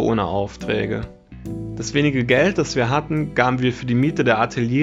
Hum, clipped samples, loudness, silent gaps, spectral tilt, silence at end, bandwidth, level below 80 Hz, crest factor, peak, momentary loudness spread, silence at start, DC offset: none; under 0.1%; -20 LUFS; none; -6 dB/octave; 0 s; 8 kHz; -44 dBFS; 20 dB; 0 dBFS; 13 LU; 0 s; under 0.1%